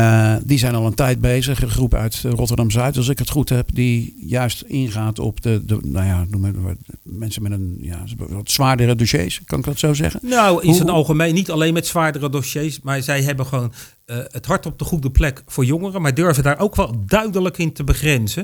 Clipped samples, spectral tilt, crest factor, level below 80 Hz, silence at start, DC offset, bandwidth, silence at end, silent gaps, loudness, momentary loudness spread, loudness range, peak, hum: under 0.1%; -5.5 dB/octave; 18 dB; -30 dBFS; 0 s; under 0.1%; over 20 kHz; 0 s; none; -18 LUFS; 10 LU; 5 LU; 0 dBFS; none